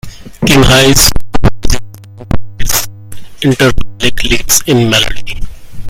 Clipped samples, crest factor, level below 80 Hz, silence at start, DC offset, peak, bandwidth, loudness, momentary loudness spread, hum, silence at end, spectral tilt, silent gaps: 2%; 8 dB; -20 dBFS; 0.05 s; under 0.1%; 0 dBFS; over 20 kHz; -10 LUFS; 15 LU; none; 0 s; -3.5 dB/octave; none